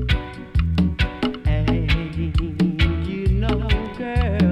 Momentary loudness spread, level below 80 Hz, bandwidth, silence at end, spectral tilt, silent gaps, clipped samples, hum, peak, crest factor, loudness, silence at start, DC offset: 4 LU; -24 dBFS; 10 kHz; 0 s; -7.5 dB/octave; none; under 0.1%; none; -8 dBFS; 14 dB; -22 LUFS; 0 s; under 0.1%